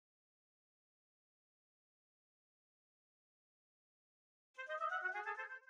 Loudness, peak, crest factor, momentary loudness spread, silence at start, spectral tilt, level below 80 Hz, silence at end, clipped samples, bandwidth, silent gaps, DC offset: -43 LUFS; -30 dBFS; 22 dB; 13 LU; 4.55 s; 0.5 dB/octave; under -90 dBFS; 0.05 s; under 0.1%; 9.6 kHz; none; under 0.1%